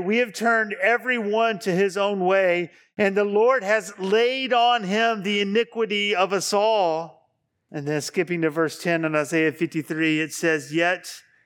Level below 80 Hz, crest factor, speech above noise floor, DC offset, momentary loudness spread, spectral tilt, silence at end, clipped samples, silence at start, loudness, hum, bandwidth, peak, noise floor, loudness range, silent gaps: -80 dBFS; 16 dB; 47 dB; under 0.1%; 7 LU; -4 dB/octave; 0.25 s; under 0.1%; 0 s; -22 LUFS; none; 18 kHz; -6 dBFS; -70 dBFS; 3 LU; none